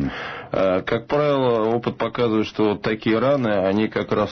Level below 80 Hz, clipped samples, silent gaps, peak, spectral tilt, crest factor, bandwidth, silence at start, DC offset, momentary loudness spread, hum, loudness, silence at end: -48 dBFS; under 0.1%; none; -10 dBFS; -7.5 dB/octave; 12 dB; 6.4 kHz; 0 s; under 0.1%; 4 LU; none; -21 LUFS; 0 s